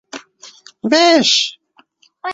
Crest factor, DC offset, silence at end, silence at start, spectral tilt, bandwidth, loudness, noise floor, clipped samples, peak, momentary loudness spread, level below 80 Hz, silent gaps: 16 dB; under 0.1%; 0 s; 0.15 s; -2 dB/octave; 8 kHz; -12 LUFS; -54 dBFS; under 0.1%; 0 dBFS; 22 LU; -66 dBFS; none